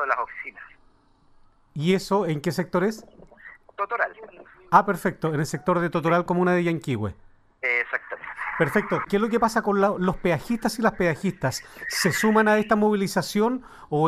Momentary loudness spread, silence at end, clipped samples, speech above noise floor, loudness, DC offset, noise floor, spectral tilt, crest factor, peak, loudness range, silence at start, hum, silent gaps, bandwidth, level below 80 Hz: 11 LU; 0 s; under 0.1%; 35 dB; -24 LUFS; under 0.1%; -58 dBFS; -5.5 dB/octave; 22 dB; -2 dBFS; 4 LU; 0 s; none; none; 15.5 kHz; -52 dBFS